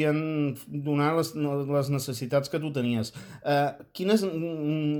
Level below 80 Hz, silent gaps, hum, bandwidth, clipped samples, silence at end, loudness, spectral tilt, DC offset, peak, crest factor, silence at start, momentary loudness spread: -68 dBFS; none; none; 19 kHz; under 0.1%; 0 s; -28 LUFS; -6.5 dB/octave; under 0.1%; -12 dBFS; 16 dB; 0 s; 6 LU